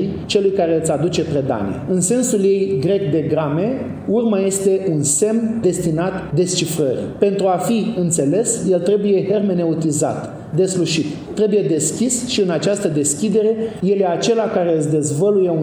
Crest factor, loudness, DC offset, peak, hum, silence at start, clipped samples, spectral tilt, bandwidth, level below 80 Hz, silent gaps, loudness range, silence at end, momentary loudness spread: 16 dB; -17 LUFS; under 0.1%; -2 dBFS; none; 0 s; under 0.1%; -5 dB/octave; over 20 kHz; -52 dBFS; none; 1 LU; 0 s; 4 LU